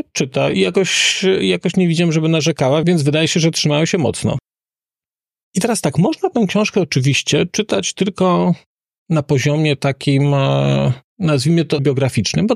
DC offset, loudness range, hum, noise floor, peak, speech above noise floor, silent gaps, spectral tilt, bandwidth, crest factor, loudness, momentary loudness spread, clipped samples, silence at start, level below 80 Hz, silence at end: under 0.1%; 4 LU; none; under -90 dBFS; -4 dBFS; over 75 dB; 5.43-5.53 s, 8.66-8.77 s, 8.98-9.06 s, 11.04-11.17 s; -5 dB/octave; 13.5 kHz; 12 dB; -16 LUFS; 5 LU; under 0.1%; 0.15 s; -50 dBFS; 0 s